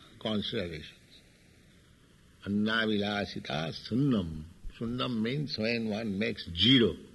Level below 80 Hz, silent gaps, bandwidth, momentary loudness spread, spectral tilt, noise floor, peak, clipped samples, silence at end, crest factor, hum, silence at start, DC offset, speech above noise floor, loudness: -54 dBFS; none; 12 kHz; 16 LU; -6 dB/octave; -60 dBFS; -10 dBFS; under 0.1%; 0.05 s; 22 dB; none; 0 s; under 0.1%; 29 dB; -30 LUFS